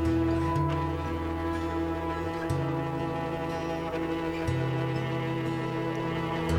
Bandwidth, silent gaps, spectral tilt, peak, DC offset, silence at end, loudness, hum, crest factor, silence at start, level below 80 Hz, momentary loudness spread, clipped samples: 16.5 kHz; none; -7.5 dB/octave; -16 dBFS; under 0.1%; 0 s; -30 LUFS; none; 14 dB; 0 s; -44 dBFS; 5 LU; under 0.1%